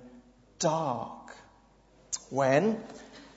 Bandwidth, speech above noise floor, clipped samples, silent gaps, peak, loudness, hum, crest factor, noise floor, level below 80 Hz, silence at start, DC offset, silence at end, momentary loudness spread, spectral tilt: 8 kHz; 32 dB; under 0.1%; none; -10 dBFS; -30 LUFS; none; 22 dB; -61 dBFS; -66 dBFS; 0 s; under 0.1%; 0.1 s; 22 LU; -4.5 dB/octave